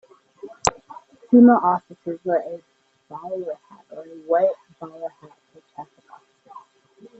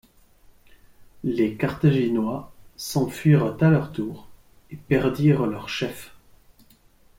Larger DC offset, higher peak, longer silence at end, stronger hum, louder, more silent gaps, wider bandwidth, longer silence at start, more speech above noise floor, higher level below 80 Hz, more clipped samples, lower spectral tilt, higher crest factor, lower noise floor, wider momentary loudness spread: neither; first, -2 dBFS vs -6 dBFS; second, 0.6 s vs 1.1 s; neither; first, -20 LUFS vs -23 LUFS; neither; second, 8.2 kHz vs 16.5 kHz; second, 0.45 s vs 1 s; about the same, 31 dB vs 34 dB; second, -58 dBFS vs -52 dBFS; neither; second, -5 dB/octave vs -7 dB/octave; about the same, 20 dB vs 18 dB; second, -51 dBFS vs -56 dBFS; first, 28 LU vs 16 LU